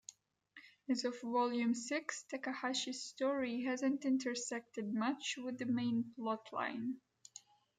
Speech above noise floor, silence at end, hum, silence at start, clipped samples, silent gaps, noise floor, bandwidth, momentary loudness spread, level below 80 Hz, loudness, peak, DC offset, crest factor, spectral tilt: 26 dB; 0.8 s; none; 0.1 s; under 0.1%; none; -64 dBFS; 9.4 kHz; 17 LU; -86 dBFS; -39 LUFS; -24 dBFS; under 0.1%; 16 dB; -3.5 dB/octave